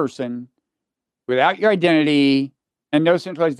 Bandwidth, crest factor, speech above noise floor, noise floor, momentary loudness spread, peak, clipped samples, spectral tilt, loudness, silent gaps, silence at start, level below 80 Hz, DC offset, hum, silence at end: 10.5 kHz; 18 dB; 67 dB; -84 dBFS; 14 LU; -2 dBFS; under 0.1%; -6.5 dB/octave; -18 LUFS; none; 0 s; -70 dBFS; under 0.1%; none; 0.05 s